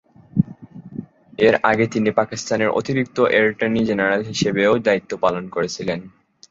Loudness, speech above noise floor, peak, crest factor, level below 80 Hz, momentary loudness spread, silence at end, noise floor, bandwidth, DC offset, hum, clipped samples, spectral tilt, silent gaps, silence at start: -19 LUFS; 20 dB; -2 dBFS; 18 dB; -54 dBFS; 14 LU; 0.4 s; -39 dBFS; 7.8 kHz; under 0.1%; none; under 0.1%; -5.5 dB/octave; none; 0.35 s